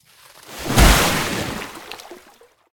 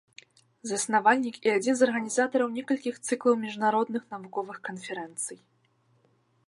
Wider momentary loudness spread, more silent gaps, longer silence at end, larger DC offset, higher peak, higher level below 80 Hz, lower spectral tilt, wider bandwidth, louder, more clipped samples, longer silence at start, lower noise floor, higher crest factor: first, 22 LU vs 13 LU; neither; second, 0.6 s vs 1.15 s; neither; first, 0 dBFS vs -8 dBFS; first, -24 dBFS vs -84 dBFS; about the same, -3.5 dB/octave vs -3.5 dB/octave; first, 18 kHz vs 11.5 kHz; first, -17 LUFS vs -28 LUFS; neither; second, 0.5 s vs 0.65 s; second, -51 dBFS vs -68 dBFS; about the same, 20 dB vs 20 dB